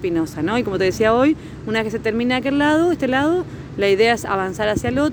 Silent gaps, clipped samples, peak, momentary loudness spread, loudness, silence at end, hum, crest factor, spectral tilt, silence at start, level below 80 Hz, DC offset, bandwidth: none; under 0.1%; -4 dBFS; 7 LU; -19 LUFS; 0 s; none; 14 dB; -5.5 dB/octave; 0 s; -42 dBFS; under 0.1%; over 20 kHz